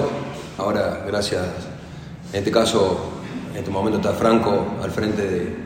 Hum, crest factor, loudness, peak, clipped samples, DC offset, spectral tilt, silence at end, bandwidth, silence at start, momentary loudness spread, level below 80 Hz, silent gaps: none; 18 dB; -22 LUFS; -4 dBFS; under 0.1%; under 0.1%; -5.5 dB/octave; 0 s; 16 kHz; 0 s; 14 LU; -46 dBFS; none